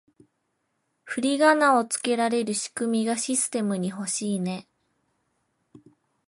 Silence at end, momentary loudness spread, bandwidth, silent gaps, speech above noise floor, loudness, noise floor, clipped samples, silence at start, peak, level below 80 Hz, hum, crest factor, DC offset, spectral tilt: 1.65 s; 9 LU; 11.5 kHz; none; 51 dB; -24 LUFS; -75 dBFS; under 0.1%; 1.05 s; -6 dBFS; -76 dBFS; none; 20 dB; under 0.1%; -3.5 dB/octave